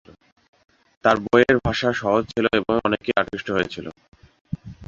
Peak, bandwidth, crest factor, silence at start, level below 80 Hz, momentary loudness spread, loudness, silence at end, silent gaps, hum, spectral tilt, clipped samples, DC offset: -2 dBFS; 7.6 kHz; 22 dB; 1.05 s; -46 dBFS; 18 LU; -21 LUFS; 0 s; 4.08-4.12 s, 4.41-4.45 s; none; -6 dB/octave; under 0.1%; under 0.1%